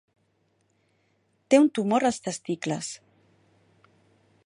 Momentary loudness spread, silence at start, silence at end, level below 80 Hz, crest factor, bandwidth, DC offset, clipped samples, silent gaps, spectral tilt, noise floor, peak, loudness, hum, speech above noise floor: 14 LU; 1.5 s; 1.5 s; -72 dBFS; 22 dB; 11.5 kHz; under 0.1%; under 0.1%; none; -5 dB/octave; -70 dBFS; -6 dBFS; -25 LUFS; none; 46 dB